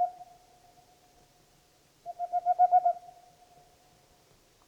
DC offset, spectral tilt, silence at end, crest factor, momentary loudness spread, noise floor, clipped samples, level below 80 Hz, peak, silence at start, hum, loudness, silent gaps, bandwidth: under 0.1%; -4 dB/octave; 1.7 s; 18 dB; 24 LU; -64 dBFS; under 0.1%; -74 dBFS; -14 dBFS; 0 s; none; -28 LUFS; none; 8.6 kHz